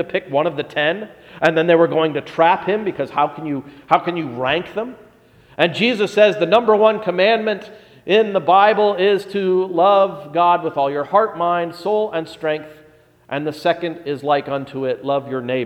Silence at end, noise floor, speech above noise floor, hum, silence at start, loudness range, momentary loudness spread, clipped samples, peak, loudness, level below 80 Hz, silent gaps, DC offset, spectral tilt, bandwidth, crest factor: 0 s; -49 dBFS; 32 dB; none; 0 s; 6 LU; 11 LU; under 0.1%; 0 dBFS; -18 LUFS; -62 dBFS; none; under 0.1%; -6 dB/octave; 13 kHz; 18 dB